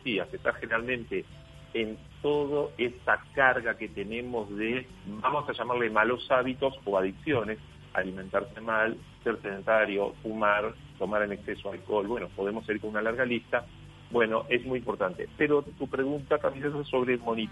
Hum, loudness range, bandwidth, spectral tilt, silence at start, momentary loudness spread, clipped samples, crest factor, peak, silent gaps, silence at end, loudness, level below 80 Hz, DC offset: none; 2 LU; 11.5 kHz; -6.5 dB/octave; 0 s; 9 LU; under 0.1%; 22 dB; -8 dBFS; none; 0 s; -30 LUFS; -56 dBFS; under 0.1%